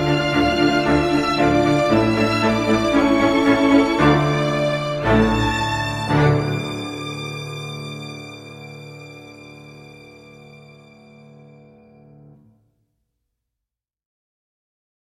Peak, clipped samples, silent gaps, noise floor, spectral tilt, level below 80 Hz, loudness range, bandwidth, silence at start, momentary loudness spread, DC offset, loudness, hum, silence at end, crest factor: -2 dBFS; under 0.1%; none; -86 dBFS; -6 dB/octave; -40 dBFS; 20 LU; 14 kHz; 0 s; 21 LU; under 0.1%; -18 LUFS; none; 4.6 s; 18 dB